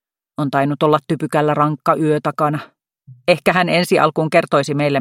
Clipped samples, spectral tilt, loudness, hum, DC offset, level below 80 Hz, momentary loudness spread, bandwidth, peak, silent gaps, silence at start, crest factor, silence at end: under 0.1%; -6 dB/octave; -17 LUFS; none; under 0.1%; -60 dBFS; 6 LU; 16 kHz; 0 dBFS; none; 0.4 s; 16 dB; 0 s